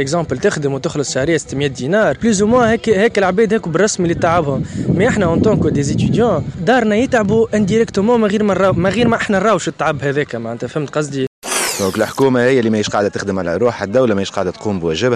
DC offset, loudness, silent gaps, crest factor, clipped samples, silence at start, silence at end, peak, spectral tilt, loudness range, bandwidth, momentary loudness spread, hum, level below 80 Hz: under 0.1%; -15 LUFS; 11.27-11.42 s; 12 dB; under 0.1%; 0 s; 0 s; -2 dBFS; -5.5 dB/octave; 2 LU; 14 kHz; 7 LU; none; -40 dBFS